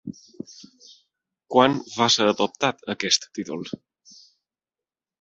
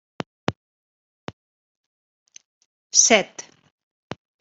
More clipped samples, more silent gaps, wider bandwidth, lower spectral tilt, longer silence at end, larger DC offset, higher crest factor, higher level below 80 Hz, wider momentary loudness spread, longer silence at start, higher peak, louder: neither; second, none vs 0.56-1.27 s, 1.33-2.26 s, 2.45-2.90 s; about the same, 8.2 kHz vs 8.2 kHz; first, -3 dB/octave vs -1 dB/octave; first, 1.5 s vs 1 s; neither; about the same, 24 dB vs 24 dB; about the same, -66 dBFS vs -66 dBFS; second, 22 LU vs 27 LU; second, 0.05 s vs 0.5 s; about the same, -2 dBFS vs -2 dBFS; second, -22 LUFS vs -18 LUFS